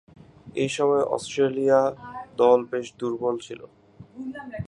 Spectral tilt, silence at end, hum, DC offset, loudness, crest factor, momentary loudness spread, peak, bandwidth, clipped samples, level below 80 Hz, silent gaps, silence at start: -5.5 dB/octave; 0 s; none; under 0.1%; -23 LUFS; 20 dB; 18 LU; -6 dBFS; 11 kHz; under 0.1%; -60 dBFS; none; 0.45 s